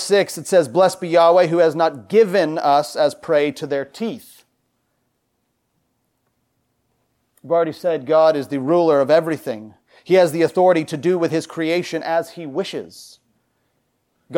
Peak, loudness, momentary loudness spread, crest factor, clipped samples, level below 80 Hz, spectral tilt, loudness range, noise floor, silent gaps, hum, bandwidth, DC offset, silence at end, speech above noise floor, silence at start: -4 dBFS; -18 LUFS; 12 LU; 16 dB; under 0.1%; -72 dBFS; -5.5 dB/octave; 11 LU; -70 dBFS; none; none; 17.5 kHz; under 0.1%; 0 s; 53 dB; 0 s